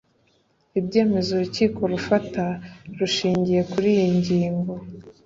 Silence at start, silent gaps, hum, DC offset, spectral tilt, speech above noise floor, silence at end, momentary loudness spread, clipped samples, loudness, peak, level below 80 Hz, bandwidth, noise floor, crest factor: 0.75 s; none; none; under 0.1%; -6.5 dB/octave; 42 dB; 0.15 s; 10 LU; under 0.1%; -22 LUFS; -6 dBFS; -54 dBFS; 7.8 kHz; -64 dBFS; 18 dB